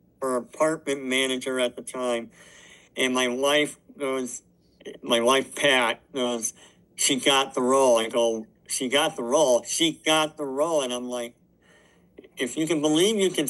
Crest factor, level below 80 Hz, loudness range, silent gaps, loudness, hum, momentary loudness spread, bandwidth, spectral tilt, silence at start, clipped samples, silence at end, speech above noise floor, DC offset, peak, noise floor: 18 dB; -70 dBFS; 5 LU; none; -24 LUFS; none; 12 LU; 12.5 kHz; -2.5 dB/octave; 0.2 s; under 0.1%; 0 s; 34 dB; under 0.1%; -6 dBFS; -58 dBFS